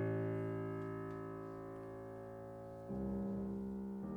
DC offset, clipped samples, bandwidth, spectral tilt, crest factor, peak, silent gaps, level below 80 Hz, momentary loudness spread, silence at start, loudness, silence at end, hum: under 0.1%; under 0.1%; 19 kHz; -10 dB/octave; 16 dB; -28 dBFS; none; -62 dBFS; 10 LU; 0 s; -45 LUFS; 0 s; none